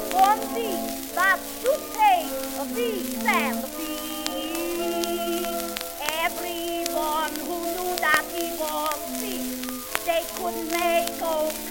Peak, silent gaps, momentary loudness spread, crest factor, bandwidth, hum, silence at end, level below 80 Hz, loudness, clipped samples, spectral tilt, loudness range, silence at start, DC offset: -2 dBFS; none; 8 LU; 24 dB; 17 kHz; none; 0 s; -52 dBFS; -25 LUFS; under 0.1%; -1.5 dB/octave; 3 LU; 0 s; under 0.1%